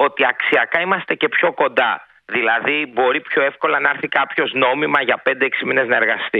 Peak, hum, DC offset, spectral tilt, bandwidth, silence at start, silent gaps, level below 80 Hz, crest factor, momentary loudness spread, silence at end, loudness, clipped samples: 0 dBFS; none; under 0.1%; -6 dB/octave; 5 kHz; 0 s; none; -68 dBFS; 18 dB; 3 LU; 0 s; -17 LUFS; under 0.1%